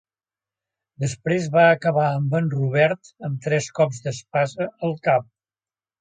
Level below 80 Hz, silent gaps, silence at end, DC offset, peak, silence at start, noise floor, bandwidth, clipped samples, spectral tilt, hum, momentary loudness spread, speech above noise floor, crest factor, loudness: -64 dBFS; none; 0.8 s; under 0.1%; -4 dBFS; 1 s; under -90 dBFS; 9.4 kHz; under 0.1%; -6 dB/octave; none; 12 LU; over 69 dB; 18 dB; -22 LUFS